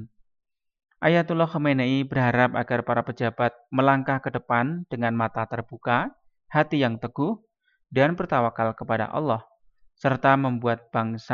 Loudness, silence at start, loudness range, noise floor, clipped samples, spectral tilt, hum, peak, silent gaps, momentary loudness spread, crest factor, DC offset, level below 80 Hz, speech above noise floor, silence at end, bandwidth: -24 LUFS; 0 s; 3 LU; -58 dBFS; under 0.1%; -8.5 dB/octave; none; -6 dBFS; none; 7 LU; 20 dB; under 0.1%; -62 dBFS; 34 dB; 0 s; 7 kHz